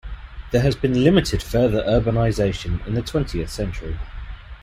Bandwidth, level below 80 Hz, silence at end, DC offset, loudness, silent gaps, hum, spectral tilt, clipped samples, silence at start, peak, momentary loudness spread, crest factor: 15 kHz; -32 dBFS; 0 s; under 0.1%; -21 LUFS; none; none; -6.5 dB/octave; under 0.1%; 0.05 s; -2 dBFS; 18 LU; 18 dB